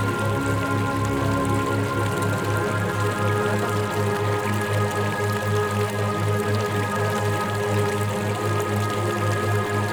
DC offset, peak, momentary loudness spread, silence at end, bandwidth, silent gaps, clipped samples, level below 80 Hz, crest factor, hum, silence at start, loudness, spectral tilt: under 0.1%; -10 dBFS; 1 LU; 0 s; 19.5 kHz; none; under 0.1%; -46 dBFS; 12 dB; none; 0 s; -23 LUFS; -6 dB/octave